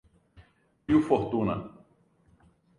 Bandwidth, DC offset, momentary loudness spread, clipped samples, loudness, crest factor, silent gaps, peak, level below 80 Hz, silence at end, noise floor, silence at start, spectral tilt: 10.5 kHz; under 0.1%; 21 LU; under 0.1%; -27 LUFS; 22 dB; none; -10 dBFS; -56 dBFS; 1.1 s; -64 dBFS; 0.4 s; -8.5 dB/octave